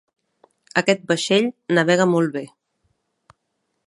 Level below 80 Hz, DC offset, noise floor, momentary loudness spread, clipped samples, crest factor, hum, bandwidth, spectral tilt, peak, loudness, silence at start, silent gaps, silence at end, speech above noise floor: -70 dBFS; under 0.1%; -74 dBFS; 8 LU; under 0.1%; 20 dB; none; 11.5 kHz; -5 dB/octave; -2 dBFS; -19 LUFS; 0.75 s; none; 1.4 s; 55 dB